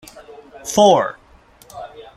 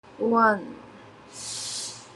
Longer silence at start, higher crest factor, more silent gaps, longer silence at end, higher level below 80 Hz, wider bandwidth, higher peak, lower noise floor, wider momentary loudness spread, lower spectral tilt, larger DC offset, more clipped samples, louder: about the same, 0.15 s vs 0.05 s; about the same, 18 dB vs 20 dB; neither; first, 0.15 s vs 0 s; first, -54 dBFS vs -68 dBFS; first, 15 kHz vs 12.5 kHz; first, -2 dBFS vs -8 dBFS; about the same, -49 dBFS vs -48 dBFS; about the same, 23 LU vs 22 LU; about the same, -4 dB/octave vs -3 dB/octave; neither; neither; first, -15 LUFS vs -25 LUFS